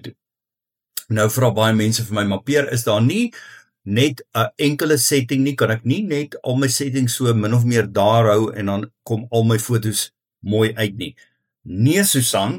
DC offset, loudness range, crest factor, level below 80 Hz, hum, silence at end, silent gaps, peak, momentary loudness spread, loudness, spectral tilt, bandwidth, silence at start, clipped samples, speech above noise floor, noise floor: under 0.1%; 2 LU; 16 dB; -58 dBFS; none; 0 s; none; -2 dBFS; 10 LU; -18 LUFS; -5 dB/octave; 17.5 kHz; 0.05 s; under 0.1%; 70 dB; -88 dBFS